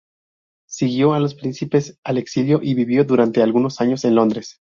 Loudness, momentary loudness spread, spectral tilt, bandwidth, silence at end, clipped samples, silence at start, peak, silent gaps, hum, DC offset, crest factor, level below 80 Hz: -18 LUFS; 8 LU; -7 dB/octave; 7.4 kHz; 0.25 s; under 0.1%; 0.7 s; -2 dBFS; 1.98-2.03 s; none; under 0.1%; 16 dB; -60 dBFS